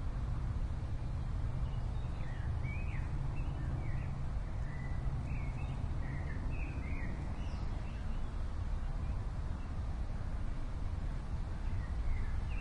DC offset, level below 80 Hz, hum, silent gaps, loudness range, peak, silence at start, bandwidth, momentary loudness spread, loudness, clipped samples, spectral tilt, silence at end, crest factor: under 0.1%; -38 dBFS; none; none; 2 LU; -24 dBFS; 0 s; 9.8 kHz; 3 LU; -41 LUFS; under 0.1%; -7.5 dB/octave; 0 s; 12 dB